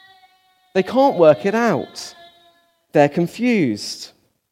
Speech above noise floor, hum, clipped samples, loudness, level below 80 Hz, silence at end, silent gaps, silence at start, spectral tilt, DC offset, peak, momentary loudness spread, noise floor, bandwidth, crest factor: 40 dB; none; under 0.1%; -18 LUFS; -66 dBFS; 0.45 s; none; 0.75 s; -6 dB/octave; under 0.1%; 0 dBFS; 19 LU; -57 dBFS; 15.5 kHz; 18 dB